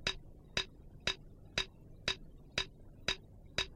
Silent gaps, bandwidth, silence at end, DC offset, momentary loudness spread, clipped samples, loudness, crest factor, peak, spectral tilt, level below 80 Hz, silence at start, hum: none; 15.5 kHz; 0 s; under 0.1%; 5 LU; under 0.1%; -40 LUFS; 24 dB; -18 dBFS; -2 dB/octave; -54 dBFS; 0 s; none